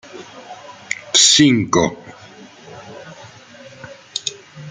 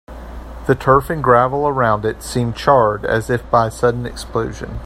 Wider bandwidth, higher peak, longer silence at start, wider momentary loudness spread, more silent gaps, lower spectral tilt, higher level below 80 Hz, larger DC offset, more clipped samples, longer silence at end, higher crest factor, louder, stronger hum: second, 9.6 kHz vs 15.5 kHz; about the same, 0 dBFS vs 0 dBFS; about the same, 0.15 s vs 0.1 s; first, 28 LU vs 12 LU; neither; second, -2.5 dB/octave vs -6 dB/octave; second, -56 dBFS vs -34 dBFS; neither; neither; about the same, 0 s vs 0 s; about the same, 20 dB vs 16 dB; first, -14 LUFS vs -17 LUFS; neither